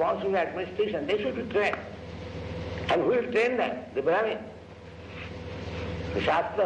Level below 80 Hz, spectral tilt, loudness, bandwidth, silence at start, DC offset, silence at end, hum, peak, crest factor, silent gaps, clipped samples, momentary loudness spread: -50 dBFS; -6.5 dB/octave; -29 LUFS; 9.2 kHz; 0 s; under 0.1%; 0 s; none; -14 dBFS; 16 dB; none; under 0.1%; 15 LU